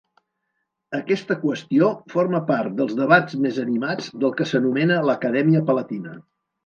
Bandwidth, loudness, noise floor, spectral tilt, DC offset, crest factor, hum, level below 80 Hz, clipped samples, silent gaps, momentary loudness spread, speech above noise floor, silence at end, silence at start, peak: 7.2 kHz; -21 LUFS; -76 dBFS; -7 dB/octave; under 0.1%; 20 dB; none; -72 dBFS; under 0.1%; none; 9 LU; 56 dB; 0.45 s; 0.9 s; 0 dBFS